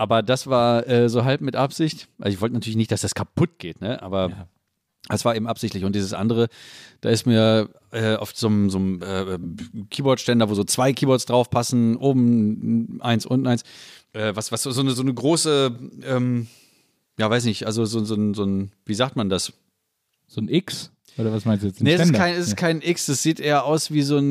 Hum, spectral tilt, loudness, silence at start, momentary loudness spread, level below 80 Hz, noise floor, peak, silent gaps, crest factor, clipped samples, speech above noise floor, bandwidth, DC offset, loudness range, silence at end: none; -5.5 dB/octave; -22 LUFS; 0 s; 11 LU; -60 dBFS; -74 dBFS; -6 dBFS; none; 16 dB; under 0.1%; 53 dB; 15.5 kHz; under 0.1%; 5 LU; 0 s